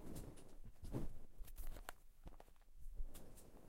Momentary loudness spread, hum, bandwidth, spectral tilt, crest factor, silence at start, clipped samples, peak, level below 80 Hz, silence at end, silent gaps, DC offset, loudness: 14 LU; none; 16 kHz; -5.5 dB/octave; 22 dB; 0 s; under 0.1%; -28 dBFS; -52 dBFS; 0 s; none; under 0.1%; -57 LUFS